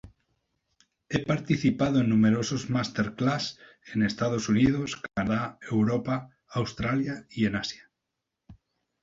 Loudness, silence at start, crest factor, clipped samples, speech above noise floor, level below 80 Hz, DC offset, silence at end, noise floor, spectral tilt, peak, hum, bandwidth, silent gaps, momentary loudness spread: -27 LUFS; 0.05 s; 18 dB; under 0.1%; 58 dB; -54 dBFS; under 0.1%; 0.5 s; -84 dBFS; -6 dB/octave; -10 dBFS; none; 7.8 kHz; none; 9 LU